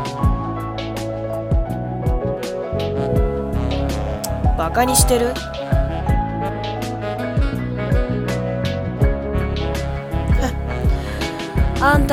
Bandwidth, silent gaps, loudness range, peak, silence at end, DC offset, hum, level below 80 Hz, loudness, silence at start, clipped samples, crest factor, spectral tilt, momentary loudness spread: 17.5 kHz; none; 3 LU; 0 dBFS; 0 s; under 0.1%; none; -24 dBFS; -21 LUFS; 0 s; under 0.1%; 20 dB; -5.5 dB/octave; 8 LU